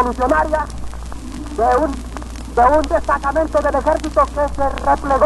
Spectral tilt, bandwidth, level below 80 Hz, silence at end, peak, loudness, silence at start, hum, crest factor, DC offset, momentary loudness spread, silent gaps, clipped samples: -6 dB/octave; 12 kHz; -28 dBFS; 0 s; -2 dBFS; -17 LUFS; 0 s; none; 14 dB; under 0.1%; 16 LU; none; under 0.1%